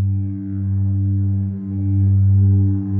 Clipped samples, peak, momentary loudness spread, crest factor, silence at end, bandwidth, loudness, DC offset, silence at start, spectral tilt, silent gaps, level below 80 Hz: under 0.1%; -8 dBFS; 9 LU; 10 dB; 0 s; 1.1 kHz; -18 LUFS; under 0.1%; 0 s; -15 dB/octave; none; -54 dBFS